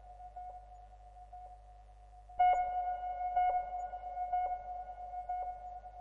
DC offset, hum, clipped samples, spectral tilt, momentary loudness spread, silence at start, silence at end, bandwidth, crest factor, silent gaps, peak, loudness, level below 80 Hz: under 0.1%; 50 Hz at -55 dBFS; under 0.1%; -5 dB/octave; 23 LU; 0 s; 0 s; 7.4 kHz; 18 dB; none; -20 dBFS; -36 LUFS; -58 dBFS